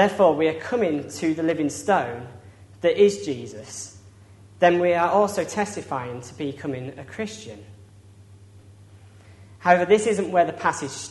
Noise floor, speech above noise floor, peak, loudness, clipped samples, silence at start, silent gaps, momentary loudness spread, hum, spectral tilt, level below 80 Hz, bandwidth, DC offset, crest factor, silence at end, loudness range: -49 dBFS; 26 dB; -2 dBFS; -23 LUFS; under 0.1%; 0 s; none; 17 LU; none; -5 dB/octave; -64 dBFS; 11.5 kHz; under 0.1%; 22 dB; 0 s; 11 LU